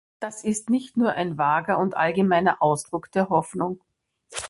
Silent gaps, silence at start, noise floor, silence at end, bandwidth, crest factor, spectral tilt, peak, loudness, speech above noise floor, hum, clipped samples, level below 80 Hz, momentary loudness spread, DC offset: none; 0.2 s; -43 dBFS; 0 s; 11.5 kHz; 18 dB; -5.5 dB/octave; -6 dBFS; -23 LUFS; 20 dB; none; under 0.1%; -62 dBFS; 10 LU; under 0.1%